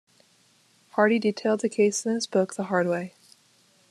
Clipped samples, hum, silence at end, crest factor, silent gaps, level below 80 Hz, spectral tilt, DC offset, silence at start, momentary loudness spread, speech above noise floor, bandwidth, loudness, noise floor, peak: under 0.1%; none; 0.8 s; 20 dB; none; -76 dBFS; -4.5 dB/octave; under 0.1%; 0.95 s; 8 LU; 38 dB; 12.5 kHz; -25 LUFS; -62 dBFS; -6 dBFS